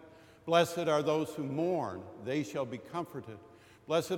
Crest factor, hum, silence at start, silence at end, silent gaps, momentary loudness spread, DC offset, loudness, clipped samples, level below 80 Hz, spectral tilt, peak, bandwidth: 22 dB; none; 0 s; 0 s; none; 16 LU; under 0.1%; -33 LUFS; under 0.1%; -74 dBFS; -5.5 dB/octave; -12 dBFS; 17.5 kHz